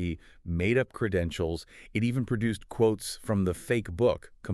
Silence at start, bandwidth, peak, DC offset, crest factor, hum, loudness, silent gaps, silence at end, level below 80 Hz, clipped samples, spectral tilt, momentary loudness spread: 0 s; 13.5 kHz; -12 dBFS; under 0.1%; 16 dB; none; -29 LUFS; none; 0 s; -48 dBFS; under 0.1%; -6.5 dB/octave; 9 LU